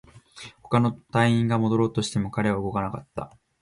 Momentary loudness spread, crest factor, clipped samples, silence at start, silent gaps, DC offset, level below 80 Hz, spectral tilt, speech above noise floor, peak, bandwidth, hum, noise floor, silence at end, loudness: 20 LU; 16 dB; under 0.1%; 0.15 s; none; under 0.1%; -52 dBFS; -6.5 dB/octave; 22 dB; -8 dBFS; 11.5 kHz; none; -46 dBFS; 0.35 s; -24 LUFS